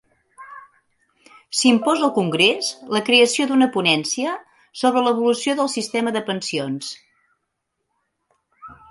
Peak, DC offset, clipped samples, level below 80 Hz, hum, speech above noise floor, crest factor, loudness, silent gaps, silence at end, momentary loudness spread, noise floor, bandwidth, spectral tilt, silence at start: 0 dBFS; under 0.1%; under 0.1%; -68 dBFS; none; 57 dB; 20 dB; -19 LUFS; none; 0.15 s; 17 LU; -76 dBFS; 11.5 kHz; -3 dB/octave; 0.4 s